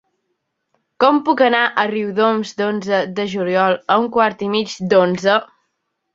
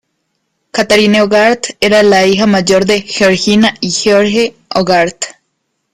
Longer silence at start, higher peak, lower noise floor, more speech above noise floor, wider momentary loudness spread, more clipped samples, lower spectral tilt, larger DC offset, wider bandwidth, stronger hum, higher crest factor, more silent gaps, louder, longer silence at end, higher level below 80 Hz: first, 1 s vs 0.75 s; about the same, 0 dBFS vs 0 dBFS; first, -73 dBFS vs -67 dBFS; about the same, 56 dB vs 57 dB; about the same, 6 LU vs 8 LU; neither; first, -5.5 dB/octave vs -4 dB/octave; neither; second, 7.8 kHz vs 15 kHz; neither; first, 18 dB vs 10 dB; neither; second, -17 LUFS vs -10 LUFS; about the same, 0.7 s vs 0.6 s; second, -62 dBFS vs -46 dBFS